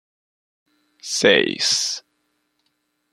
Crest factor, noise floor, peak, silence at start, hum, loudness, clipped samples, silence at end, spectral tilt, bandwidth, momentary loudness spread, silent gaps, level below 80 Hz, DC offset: 22 dB; -71 dBFS; -2 dBFS; 1.05 s; none; -18 LUFS; under 0.1%; 1.15 s; -1.5 dB/octave; 14 kHz; 15 LU; none; -68 dBFS; under 0.1%